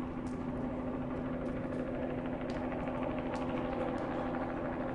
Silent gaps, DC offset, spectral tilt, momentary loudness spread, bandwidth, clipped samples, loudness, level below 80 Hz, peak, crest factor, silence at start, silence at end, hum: none; under 0.1%; -8 dB/octave; 2 LU; 10.5 kHz; under 0.1%; -37 LUFS; -50 dBFS; -22 dBFS; 14 dB; 0 s; 0 s; none